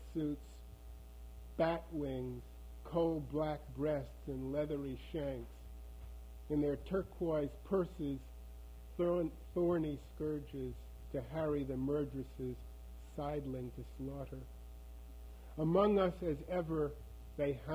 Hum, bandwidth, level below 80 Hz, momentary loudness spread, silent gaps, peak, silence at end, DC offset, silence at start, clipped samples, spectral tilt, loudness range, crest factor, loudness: none; over 20 kHz; -52 dBFS; 19 LU; none; -18 dBFS; 0 s; under 0.1%; 0 s; under 0.1%; -8.5 dB/octave; 4 LU; 20 dB; -39 LUFS